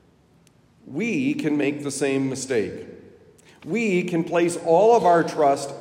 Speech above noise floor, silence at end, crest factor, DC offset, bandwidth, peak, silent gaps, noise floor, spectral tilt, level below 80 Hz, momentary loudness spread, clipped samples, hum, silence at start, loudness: 36 dB; 0 s; 18 dB; under 0.1%; 16 kHz; -6 dBFS; none; -57 dBFS; -5.5 dB/octave; -68 dBFS; 14 LU; under 0.1%; none; 0.85 s; -22 LUFS